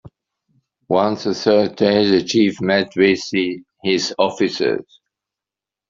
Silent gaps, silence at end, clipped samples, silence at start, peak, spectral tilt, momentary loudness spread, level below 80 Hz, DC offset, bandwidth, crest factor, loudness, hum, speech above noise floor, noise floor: none; 1.05 s; under 0.1%; 0.05 s; -2 dBFS; -5 dB/octave; 6 LU; -60 dBFS; under 0.1%; 7.6 kHz; 16 dB; -18 LUFS; none; 71 dB; -88 dBFS